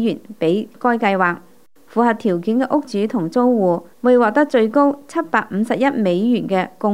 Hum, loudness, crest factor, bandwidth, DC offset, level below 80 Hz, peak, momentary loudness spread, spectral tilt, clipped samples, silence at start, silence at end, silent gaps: none; -18 LUFS; 16 dB; 12.5 kHz; 0.4%; -68 dBFS; -2 dBFS; 6 LU; -7 dB/octave; under 0.1%; 0 s; 0 s; none